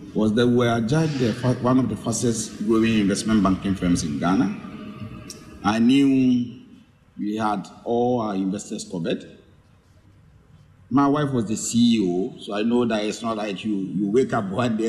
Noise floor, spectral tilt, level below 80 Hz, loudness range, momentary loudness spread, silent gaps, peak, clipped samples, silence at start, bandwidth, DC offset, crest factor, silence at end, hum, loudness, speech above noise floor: -54 dBFS; -5.5 dB/octave; -50 dBFS; 6 LU; 11 LU; none; -8 dBFS; under 0.1%; 0 s; 13 kHz; under 0.1%; 14 dB; 0 s; none; -22 LUFS; 33 dB